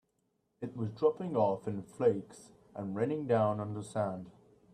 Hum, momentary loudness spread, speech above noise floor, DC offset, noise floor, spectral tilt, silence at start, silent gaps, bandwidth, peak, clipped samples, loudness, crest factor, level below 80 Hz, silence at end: none; 16 LU; 45 dB; under 0.1%; -79 dBFS; -8 dB/octave; 0.6 s; none; 10.5 kHz; -16 dBFS; under 0.1%; -34 LUFS; 18 dB; -72 dBFS; 0.45 s